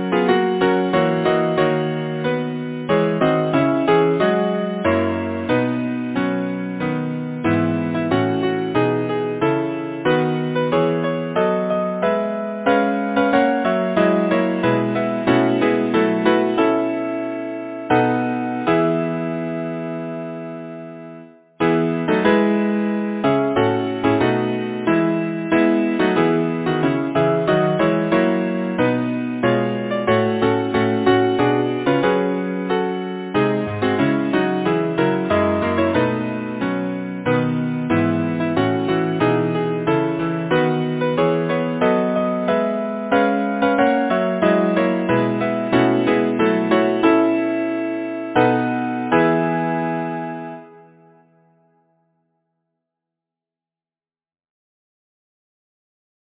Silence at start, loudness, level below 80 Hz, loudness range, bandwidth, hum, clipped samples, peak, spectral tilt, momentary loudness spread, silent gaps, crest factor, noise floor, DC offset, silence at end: 0 s; -19 LUFS; -52 dBFS; 3 LU; 4 kHz; none; under 0.1%; 0 dBFS; -11 dB/octave; 7 LU; none; 18 dB; under -90 dBFS; under 0.1%; 5.55 s